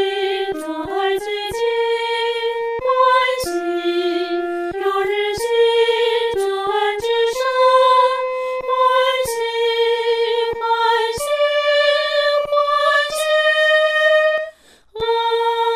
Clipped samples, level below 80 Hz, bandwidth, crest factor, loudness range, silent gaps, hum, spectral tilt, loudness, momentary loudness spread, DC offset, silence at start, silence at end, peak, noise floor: under 0.1%; -54 dBFS; 16 kHz; 14 dB; 3 LU; none; none; -2 dB/octave; -17 LUFS; 8 LU; under 0.1%; 0 s; 0 s; -4 dBFS; -40 dBFS